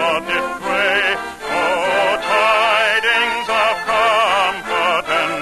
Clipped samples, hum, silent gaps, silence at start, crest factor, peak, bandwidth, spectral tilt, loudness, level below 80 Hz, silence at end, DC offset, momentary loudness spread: under 0.1%; none; none; 0 s; 12 dB; -4 dBFS; 13 kHz; -2 dB/octave; -16 LUFS; -50 dBFS; 0 s; under 0.1%; 6 LU